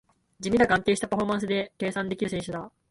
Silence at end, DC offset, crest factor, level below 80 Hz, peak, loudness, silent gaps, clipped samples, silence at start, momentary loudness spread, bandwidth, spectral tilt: 0.2 s; under 0.1%; 18 dB; -54 dBFS; -8 dBFS; -27 LUFS; none; under 0.1%; 0.4 s; 13 LU; 11.5 kHz; -5 dB/octave